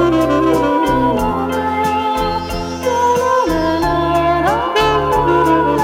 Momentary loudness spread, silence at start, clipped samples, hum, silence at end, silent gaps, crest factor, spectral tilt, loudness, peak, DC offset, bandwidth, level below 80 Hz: 5 LU; 0 s; under 0.1%; none; 0 s; none; 12 dB; -5.5 dB/octave; -15 LUFS; -2 dBFS; under 0.1%; 17 kHz; -32 dBFS